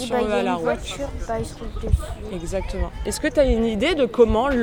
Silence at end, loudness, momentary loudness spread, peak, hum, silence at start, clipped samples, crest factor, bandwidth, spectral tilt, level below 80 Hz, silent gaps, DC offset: 0 s; -23 LUFS; 12 LU; -4 dBFS; none; 0 s; under 0.1%; 18 dB; 18 kHz; -5.5 dB/octave; -30 dBFS; none; 0.2%